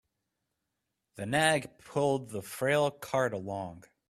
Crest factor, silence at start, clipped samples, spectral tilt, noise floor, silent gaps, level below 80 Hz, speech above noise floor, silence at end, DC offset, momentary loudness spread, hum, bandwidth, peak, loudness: 22 dB; 1.15 s; under 0.1%; -4.5 dB/octave; -85 dBFS; none; -68 dBFS; 54 dB; 0.3 s; under 0.1%; 13 LU; none; 15.5 kHz; -10 dBFS; -31 LUFS